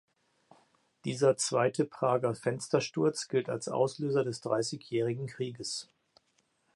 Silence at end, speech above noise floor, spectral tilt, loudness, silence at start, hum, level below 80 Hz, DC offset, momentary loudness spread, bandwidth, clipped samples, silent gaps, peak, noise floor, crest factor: 0.9 s; 43 dB; -5 dB/octave; -31 LUFS; 1.05 s; none; -76 dBFS; under 0.1%; 9 LU; 11.5 kHz; under 0.1%; none; -12 dBFS; -74 dBFS; 20 dB